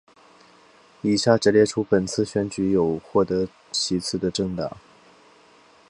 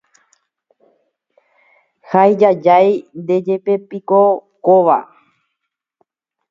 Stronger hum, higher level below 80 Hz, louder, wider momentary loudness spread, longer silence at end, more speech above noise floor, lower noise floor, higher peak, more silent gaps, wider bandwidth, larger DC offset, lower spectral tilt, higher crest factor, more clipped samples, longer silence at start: neither; first, -52 dBFS vs -70 dBFS; second, -23 LUFS vs -14 LUFS; about the same, 9 LU vs 8 LU; second, 1.1 s vs 1.45 s; second, 32 dB vs 64 dB; second, -54 dBFS vs -77 dBFS; about the same, -2 dBFS vs 0 dBFS; neither; first, 11 kHz vs 7.2 kHz; neither; second, -5 dB/octave vs -8.5 dB/octave; first, 22 dB vs 16 dB; neither; second, 1.05 s vs 2.1 s